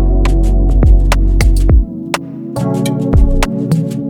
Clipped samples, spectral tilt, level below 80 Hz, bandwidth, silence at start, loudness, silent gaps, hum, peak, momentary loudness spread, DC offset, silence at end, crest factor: under 0.1%; -6.5 dB/octave; -12 dBFS; 13.5 kHz; 0 s; -14 LUFS; none; none; 0 dBFS; 9 LU; under 0.1%; 0 s; 10 dB